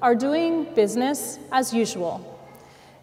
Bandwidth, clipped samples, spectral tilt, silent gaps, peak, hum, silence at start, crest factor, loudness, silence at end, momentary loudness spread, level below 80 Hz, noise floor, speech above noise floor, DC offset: 16 kHz; under 0.1%; -4 dB/octave; none; -8 dBFS; none; 0 s; 16 dB; -23 LUFS; 0.45 s; 9 LU; -66 dBFS; -48 dBFS; 26 dB; under 0.1%